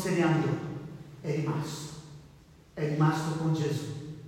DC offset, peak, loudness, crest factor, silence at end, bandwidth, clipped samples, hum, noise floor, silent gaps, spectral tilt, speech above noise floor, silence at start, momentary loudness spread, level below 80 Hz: under 0.1%; -14 dBFS; -30 LUFS; 16 dB; 0 s; 15 kHz; under 0.1%; none; -55 dBFS; none; -6.5 dB/octave; 27 dB; 0 s; 17 LU; -62 dBFS